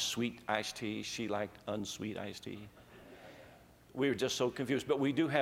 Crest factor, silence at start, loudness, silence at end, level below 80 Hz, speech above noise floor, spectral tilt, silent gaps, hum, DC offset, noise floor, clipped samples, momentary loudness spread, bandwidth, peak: 22 dB; 0 s; -36 LUFS; 0 s; -70 dBFS; 24 dB; -4 dB/octave; none; none; under 0.1%; -59 dBFS; under 0.1%; 22 LU; 16.5 kHz; -14 dBFS